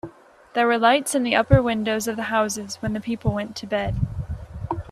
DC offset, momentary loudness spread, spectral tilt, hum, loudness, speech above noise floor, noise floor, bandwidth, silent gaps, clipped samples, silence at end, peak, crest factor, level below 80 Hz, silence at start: under 0.1%; 13 LU; -5 dB/octave; none; -22 LUFS; 22 dB; -43 dBFS; 15 kHz; none; under 0.1%; 0 s; -2 dBFS; 20 dB; -38 dBFS; 0.05 s